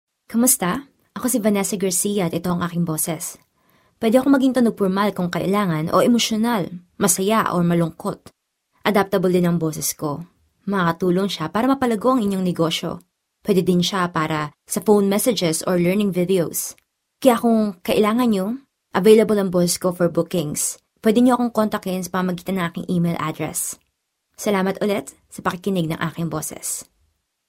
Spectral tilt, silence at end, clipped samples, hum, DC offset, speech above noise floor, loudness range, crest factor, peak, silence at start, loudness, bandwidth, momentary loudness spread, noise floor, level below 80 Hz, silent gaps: -5 dB/octave; 0.65 s; under 0.1%; none; under 0.1%; 54 dB; 5 LU; 20 dB; 0 dBFS; 0.3 s; -20 LUFS; 16 kHz; 10 LU; -73 dBFS; -56 dBFS; none